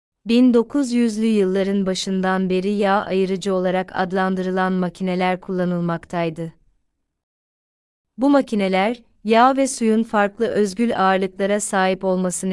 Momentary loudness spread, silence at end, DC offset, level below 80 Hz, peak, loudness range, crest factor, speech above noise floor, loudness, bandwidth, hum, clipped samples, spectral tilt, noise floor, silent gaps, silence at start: 7 LU; 0 s; under 0.1%; -56 dBFS; -4 dBFS; 6 LU; 16 dB; 51 dB; -19 LUFS; 12 kHz; none; under 0.1%; -5.5 dB/octave; -70 dBFS; 7.23-8.04 s; 0.25 s